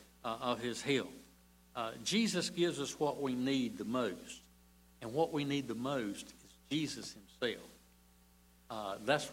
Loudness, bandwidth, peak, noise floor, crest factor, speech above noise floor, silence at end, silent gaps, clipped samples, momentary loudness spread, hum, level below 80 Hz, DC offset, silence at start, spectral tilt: -37 LUFS; 16 kHz; -18 dBFS; -65 dBFS; 20 dB; 28 dB; 0 s; none; under 0.1%; 14 LU; 60 Hz at -65 dBFS; -70 dBFS; under 0.1%; 0 s; -4 dB/octave